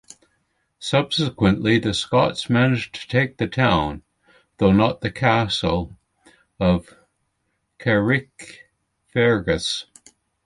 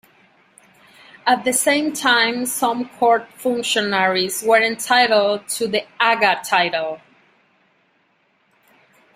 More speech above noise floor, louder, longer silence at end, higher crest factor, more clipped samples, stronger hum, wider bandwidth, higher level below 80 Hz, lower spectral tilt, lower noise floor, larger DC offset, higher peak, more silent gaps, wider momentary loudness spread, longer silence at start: first, 53 dB vs 44 dB; about the same, -20 LUFS vs -18 LUFS; second, 0.65 s vs 2.2 s; about the same, 18 dB vs 18 dB; neither; neither; second, 11.5 kHz vs 16 kHz; first, -42 dBFS vs -66 dBFS; first, -6 dB/octave vs -2 dB/octave; first, -73 dBFS vs -62 dBFS; neither; about the same, -4 dBFS vs -2 dBFS; neither; first, 10 LU vs 7 LU; second, 0.8 s vs 1.25 s